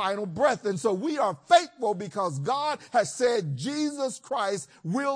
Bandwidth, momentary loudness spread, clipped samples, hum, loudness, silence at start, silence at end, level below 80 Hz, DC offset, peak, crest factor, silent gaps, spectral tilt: 10.5 kHz; 8 LU; under 0.1%; none; -27 LUFS; 0 s; 0 s; -70 dBFS; under 0.1%; -6 dBFS; 20 dB; none; -4.5 dB/octave